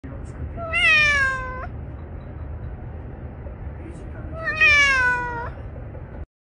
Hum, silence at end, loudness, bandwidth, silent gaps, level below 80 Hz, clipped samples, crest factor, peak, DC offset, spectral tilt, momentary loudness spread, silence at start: none; 0.2 s; -17 LUFS; 10 kHz; none; -36 dBFS; under 0.1%; 18 dB; -6 dBFS; under 0.1%; -3 dB/octave; 22 LU; 0.05 s